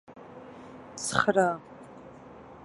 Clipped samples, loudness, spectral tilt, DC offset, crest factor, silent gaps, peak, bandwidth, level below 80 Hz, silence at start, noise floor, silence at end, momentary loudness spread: under 0.1%; -27 LUFS; -4 dB/octave; under 0.1%; 26 dB; none; -6 dBFS; 11.5 kHz; -62 dBFS; 0.1 s; -48 dBFS; 0 s; 24 LU